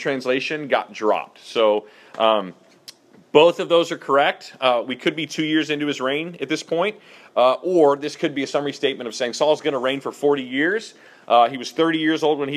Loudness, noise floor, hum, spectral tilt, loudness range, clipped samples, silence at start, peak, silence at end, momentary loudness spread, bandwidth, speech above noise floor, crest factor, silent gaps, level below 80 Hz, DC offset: -21 LUFS; -47 dBFS; none; -4.5 dB/octave; 3 LU; under 0.1%; 0 s; 0 dBFS; 0 s; 8 LU; 13.5 kHz; 26 dB; 20 dB; none; -74 dBFS; under 0.1%